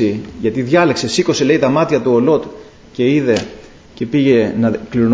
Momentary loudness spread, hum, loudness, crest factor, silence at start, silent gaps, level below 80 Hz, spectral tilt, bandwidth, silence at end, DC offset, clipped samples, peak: 8 LU; none; -15 LUFS; 14 dB; 0 s; none; -46 dBFS; -6 dB/octave; 8 kHz; 0 s; under 0.1%; under 0.1%; 0 dBFS